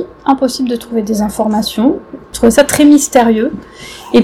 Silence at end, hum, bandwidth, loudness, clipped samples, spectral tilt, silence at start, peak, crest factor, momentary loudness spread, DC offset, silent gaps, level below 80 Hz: 0 s; none; 16.5 kHz; -12 LUFS; 1%; -4 dB/octave; 0 s; 0 dBFS; 12 dB; 16 LU; under 0.1%; none; -38 dBFS